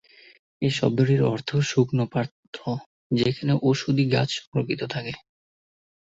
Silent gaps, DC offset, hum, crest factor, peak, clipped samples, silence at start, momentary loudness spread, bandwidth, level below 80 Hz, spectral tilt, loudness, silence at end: 2.31-2.53 s, 2.86-3.10 s, 4.47-4.52 s; under 0.1%; none; 18 dB; -6 dBFS; under 0.1%; 0.6 s; 11 LU; 8 kHz; -58 dBFS; -6.5 dB/octave; -24 LUFS; 0.95 s